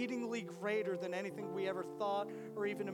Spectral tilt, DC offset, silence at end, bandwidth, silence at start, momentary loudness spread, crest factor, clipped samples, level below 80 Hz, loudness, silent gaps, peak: -5.5 dB/octave; under 0.1%; 0 s; 18 kHz; 0 s; 4 LU; 14 dB; under 0.1%; under -90 dBFS; -40 LUFS; none; -26 dBFS